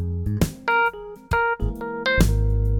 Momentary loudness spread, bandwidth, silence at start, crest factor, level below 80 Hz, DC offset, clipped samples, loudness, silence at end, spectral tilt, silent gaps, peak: 7 LU; 17.5 kHz; 0 s; 18 dB; -26 dBFS; under 0.1%; under 0.1%; -23 LUFS; 0 s; -6 dB/octave; none; -2 dBFS